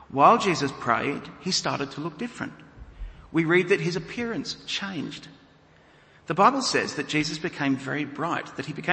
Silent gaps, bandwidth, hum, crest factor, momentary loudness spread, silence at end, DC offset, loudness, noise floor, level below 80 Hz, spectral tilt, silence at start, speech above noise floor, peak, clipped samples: none; 8.8 kHz; none; 22 dB; 14 LU; 0 s; under 0.1%; -25 LUFS; -56 dBFS; -52 dBFS; -4.5 dB/octave; 0.1 s; 30 dB; -4 dBFS; under 0.1%